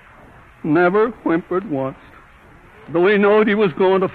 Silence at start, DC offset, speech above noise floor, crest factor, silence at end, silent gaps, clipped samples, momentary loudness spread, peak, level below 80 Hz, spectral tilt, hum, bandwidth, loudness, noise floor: 0.65 s; under 0.1%; 29 dB; 14 dB; 0 s; none; under 0.1%; 11 LU; -4 dBFS; -52 dBFS; -9 dB/octave; none; 4.6 kHz; -17 LUFS; -46 dBFS